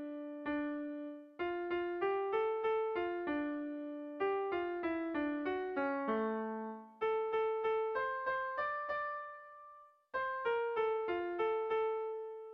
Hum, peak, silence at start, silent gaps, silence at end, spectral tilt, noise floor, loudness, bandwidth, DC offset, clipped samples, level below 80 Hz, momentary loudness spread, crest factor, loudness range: none; -24 dBFS; 0 s; none; 0 s; -7 dB/octave; -59 dBFS; -38 LUFS; 5.4 kHz; under 0.1%; under 0.1%; -74 dBFS; 9 LU; 14 dB; 1 LU